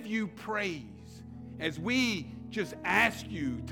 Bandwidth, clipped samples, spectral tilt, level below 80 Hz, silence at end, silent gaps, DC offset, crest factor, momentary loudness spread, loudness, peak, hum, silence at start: 18 kHz; under 0.1%; -4.5 dB/octave; -60 dBFS; 0 s; none; under 0.1%; 22 dB; 20 LU; -31 LUFS; -12 dBFS; none; 0 s